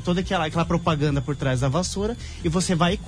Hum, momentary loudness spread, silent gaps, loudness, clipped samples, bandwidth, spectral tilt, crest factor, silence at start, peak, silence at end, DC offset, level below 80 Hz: none; 5 LU; none; -24 LUFS; under 0.1%; 10.5 kHz; -5.5 dB/octave; 14 dB; 0 s; -10 dBFS; 0 s; under 0.1%; -36 dBFS